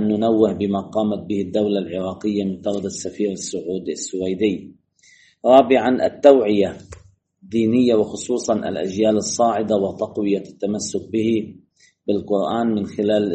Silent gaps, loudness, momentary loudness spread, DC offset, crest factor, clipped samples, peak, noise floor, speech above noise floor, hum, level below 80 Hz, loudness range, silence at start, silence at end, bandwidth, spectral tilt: none; -20 LUFS; 12 LU; under 0.1%; 20 dB; under 0.1%; 0 dBFS; -54 dBFS; 35 dB; none; -60 dBFS; 7 LU; 0 s; 0 s; 8.8 kHz; -5.5 dB/octave